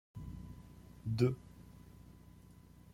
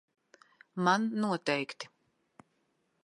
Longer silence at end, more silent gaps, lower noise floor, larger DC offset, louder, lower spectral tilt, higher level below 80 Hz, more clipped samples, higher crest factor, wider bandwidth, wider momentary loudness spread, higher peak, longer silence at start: second, 0.05 s vs 1.2 s; neither; second, -59 dBFS vs -76 dBFS; neither; second, -39 LUFS vs -31 LUFS; first, -8 dB/octave vs -5 dB/octave; first, -58 dBFS vs -84 dBFS; neither; about the same, 24 dB vs 20 dB; first, 15.5 kHz vs 11.5 kHz; first, 25 LU vs 17 LU; second, -18 dBFS vs -14 dBFS; second, 0.15 s vs 0.75 s